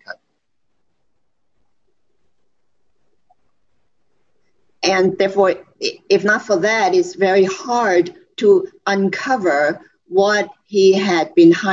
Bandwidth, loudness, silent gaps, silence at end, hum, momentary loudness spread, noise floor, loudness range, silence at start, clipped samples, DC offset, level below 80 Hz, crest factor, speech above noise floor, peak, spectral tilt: 7.6 kHz; -16 LUFS; none; 0 s; none; 8 LU; -73 dBFS; 5 LU; 0.1 s; under 0.1%; under 0.1%; -68 dBFS; 16 dB; 58 dB; -2 dBFS; -5 dB/octave